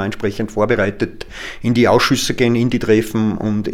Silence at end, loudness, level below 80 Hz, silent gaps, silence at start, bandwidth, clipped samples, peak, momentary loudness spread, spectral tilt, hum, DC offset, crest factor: 0 s; -16 LUFS; -38 dBFS; none; 0 s; 16.5 kHz; under 0.1%; 0 dBFS; 11 LU; -5.5 dB/octave; none; under 0.1%; 16 dB